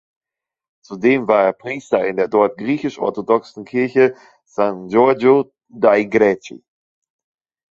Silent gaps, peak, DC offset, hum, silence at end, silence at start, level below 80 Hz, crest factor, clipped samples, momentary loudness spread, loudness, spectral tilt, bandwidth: none; 0 dBFS; under 0.1%; none; 1.15 s; 0.9 s; -62 dBFS; 18 dB; under 0.1%; 11 LU; -17 LUFS; -7 dB/octave; 7.6 kHz